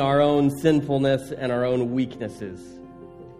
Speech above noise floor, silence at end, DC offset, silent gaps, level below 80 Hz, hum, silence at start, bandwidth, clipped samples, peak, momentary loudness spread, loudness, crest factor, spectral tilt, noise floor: 20 dB; 0 s; under 0.1%; none; -56 dBFS; none; 0 s; 15 kHz; under 0.1%; -6 dBFS; 23 LU; -23 LUFS; 18 dB; -7 dB/octave; -43 dBFS